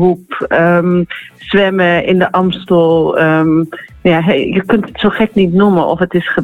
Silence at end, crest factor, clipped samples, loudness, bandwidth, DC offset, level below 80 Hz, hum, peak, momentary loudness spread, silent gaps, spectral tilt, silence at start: 0 s; 10 dB; under 0.1%; -12 LUFS; 4.6 kHz; under 0.1%; -42 dBFS; none; 0 dBFS; 5 LU; none; -8.5 dB/octave; 0 s